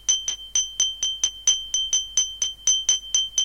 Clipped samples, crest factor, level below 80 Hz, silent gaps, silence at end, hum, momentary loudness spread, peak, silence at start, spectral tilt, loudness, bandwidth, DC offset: under 0.1%; 18 dB; -52 dBFS; none; 0 s; none; 4 LU; -6 dBFS; 0.1 s; 3.5 dB/octave; -21 LUFS; 17 kHz; under 0.1%